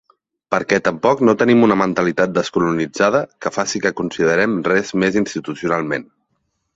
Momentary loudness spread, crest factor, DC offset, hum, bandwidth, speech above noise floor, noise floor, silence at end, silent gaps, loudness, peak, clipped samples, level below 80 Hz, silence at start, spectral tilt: 9 LU; 18 dB; under 0.1%; none; 8 kHz; 53 dB; -70 dBFS; 0.75 s; none; -17 LUFS; 0 dBFS; under 0.1%; -54 dBFS; 0.5 s; -5.5 dB/octave